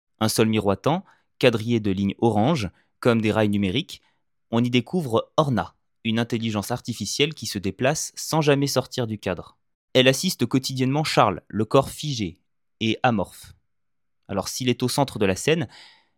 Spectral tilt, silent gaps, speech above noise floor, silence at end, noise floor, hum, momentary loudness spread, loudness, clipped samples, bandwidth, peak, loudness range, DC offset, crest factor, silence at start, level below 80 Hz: -5 dB/octave; 9.75-9.88 s; 63 dB; 0.35 s; -85 dBFS; none; 9 LU; -23 LUFS; under 0.1%; 17.5 kHz; -2 dBFS; 3 LU; under 0.1%; 22 dB; 0.2 s; -58 dBFS